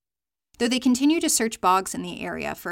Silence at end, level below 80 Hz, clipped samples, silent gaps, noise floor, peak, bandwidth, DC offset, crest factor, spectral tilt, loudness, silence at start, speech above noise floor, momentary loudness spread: 0 s; -58 dBFS; under 0.1%; none; under -90 dBFS; -8 dBFS; 17 kHz; under 0.1%; 16 dB; -2.5 dB/octave; -23 LUFS; 0.6 s; over 67 dB; 11 LU